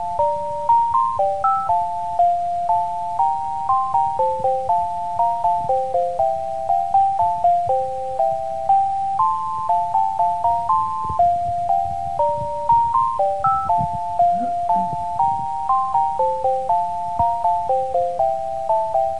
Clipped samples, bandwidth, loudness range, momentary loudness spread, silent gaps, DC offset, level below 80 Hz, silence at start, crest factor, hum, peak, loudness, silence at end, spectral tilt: under 0.1%; 11 kHz; 1 LU; 4 LU; none; 2%; -48 dBFS; 0 s; 12 dB; none; -6 dBFS; -20 LUFS; 0 s; -6.5 dB/octave